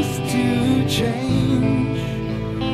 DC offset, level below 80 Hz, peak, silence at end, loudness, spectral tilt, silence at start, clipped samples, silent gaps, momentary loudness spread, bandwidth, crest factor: under 0.1%; -38 dBFS; -8 dBFS; 0 s; -20 LUFS; -6 dB/octave; 0 s; under 0.1%; none; 7 LU; 14 kHz; 12 dB